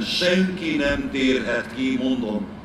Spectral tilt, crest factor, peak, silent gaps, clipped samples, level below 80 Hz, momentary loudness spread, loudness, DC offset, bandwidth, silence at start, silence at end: -5 dB/octave; 16 dB; -6 dBFS; none; under 0.1%; -44 dBFS; 6 LU; -22 LUFS; under 0.1%; 13.5 kHz; 0 s; 0 s